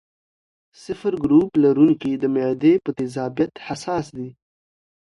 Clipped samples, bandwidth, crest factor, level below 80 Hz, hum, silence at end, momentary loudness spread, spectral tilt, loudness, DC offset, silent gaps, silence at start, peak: under 0.1%; 11 kHz; 16 dB; -56 dBFS; none; 0.75 s; 16 LU; -7.5 dB/octave; -20 LUFS; under 0.1%; none; 0.9 s; -4 dBFS